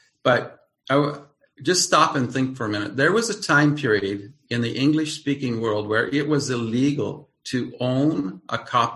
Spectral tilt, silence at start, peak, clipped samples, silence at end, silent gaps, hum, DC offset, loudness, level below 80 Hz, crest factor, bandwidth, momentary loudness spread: -4.5 dB/octave; 0.25 s; -4 dBFS; under 0.1%; 0 s; none; none; under 0.1%; -22 LUFS; -60 dBFS; 20 dB; 12.5 kHz; 11 LU